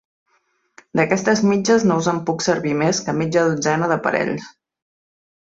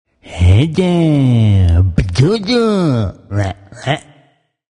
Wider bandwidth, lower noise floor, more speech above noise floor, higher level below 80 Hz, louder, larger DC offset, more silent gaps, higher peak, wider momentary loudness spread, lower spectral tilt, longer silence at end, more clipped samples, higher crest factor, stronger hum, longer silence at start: second, 8 kHz vs 10.5 kHz; first, -65 dBFS vs -54 dBFS; first, 47 dB vs 42 dB; second, -60 dBFS vs -28 dBFS; second, -19 LUFS vs -14 LUFS; neither; neither; about the same, -2 dBFS vs 0 dBFS; second, 5 LU vs 9 LU; second, -5 dB/octave vs -7.5 dB/octave; first, 1.1 s vs 0.75 s; neither; about the same, 18 dB vs 14 dB; neither; first, 0.95 s vs 0.25 s